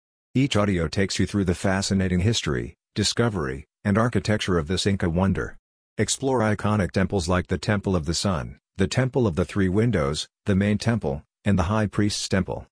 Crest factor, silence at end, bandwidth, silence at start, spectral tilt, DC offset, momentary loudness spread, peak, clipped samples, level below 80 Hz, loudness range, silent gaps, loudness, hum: 18 dB; 0.15 s; 10.5 kHz; 0.35 s; -5.5 dB/octave; under 0.1%; 7 LU; -6 dBFS; under 0.1%; -42 dBFS; 1 LU; 5.59-5.96 s; -24 LUFS; none